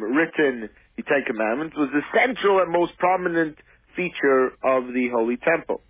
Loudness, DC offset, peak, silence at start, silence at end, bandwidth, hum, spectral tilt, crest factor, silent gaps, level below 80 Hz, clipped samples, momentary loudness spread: -22 LUFS; under 0.1%; -8 dBFS; 0 s; 0.15 s; 3.8 kHz; none; -9 dB/octave; 16 dB; none; -60 dBFS; under 0.1%; 9 LU